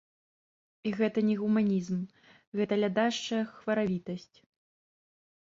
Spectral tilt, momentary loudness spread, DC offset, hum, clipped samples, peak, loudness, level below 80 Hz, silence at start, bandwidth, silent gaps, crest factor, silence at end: -6 dB/octave; 11 LU; under 0.1%; none; under 0.1%; -14 dBFS; -30 LUFS; -72 dBFS; 0.85 s; 7.6 kHz; 2.47-2.52 s; 18 dB; 1.35 s